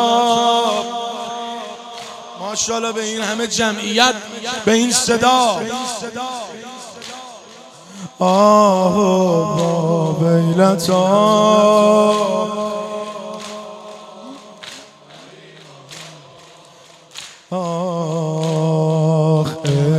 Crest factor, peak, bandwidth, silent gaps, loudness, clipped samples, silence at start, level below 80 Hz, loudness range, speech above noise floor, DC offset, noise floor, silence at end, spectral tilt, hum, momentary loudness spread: 18 dB; 0 dBFS; 14.5 kHz; none; -16 LUFS; under 0.1%; 0 s; -60 dBFS; 18 LU; 29 dB; under 0.1%; -44 dBFS; 0 s; -4.5 dB/octave; none; 22 LU